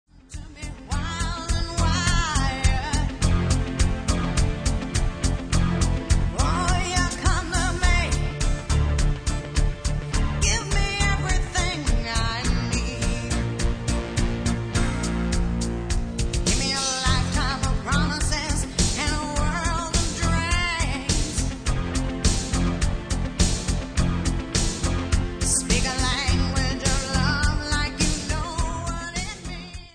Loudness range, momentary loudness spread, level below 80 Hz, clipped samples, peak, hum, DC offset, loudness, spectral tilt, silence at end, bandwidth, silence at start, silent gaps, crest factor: 2 LU; 6 LU; -26 dBFS; under 0.1%; -6 dBFS; none; under 0.1%; -24 LUFS; -4 dB/octave; 0.05 s; 10.5 kHz; 0.3 s; none; 18 dB